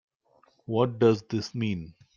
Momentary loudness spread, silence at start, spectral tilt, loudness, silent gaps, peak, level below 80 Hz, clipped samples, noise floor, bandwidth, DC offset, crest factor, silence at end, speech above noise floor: 12 LU; 0.7 s; -7 dB/octave; -27 LUFS; none; -8 dBFS; -64 dBFS; under 0.1%; -65 dBFS; 7.4 kHz; under 0.1%; 20 dB; 0.25 s; 38 dB